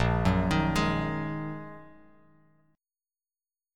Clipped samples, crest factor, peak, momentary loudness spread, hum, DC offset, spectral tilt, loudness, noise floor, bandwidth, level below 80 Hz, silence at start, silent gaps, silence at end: under 0.1%; 20 dB; -10 dBFS; 18 LU; none; under 0.1%; -6.5 dB/octave; -28 LUFS; under -90 dBFS; 16.5 kHz; -42 dBFS; 0 s; none; 1.85 s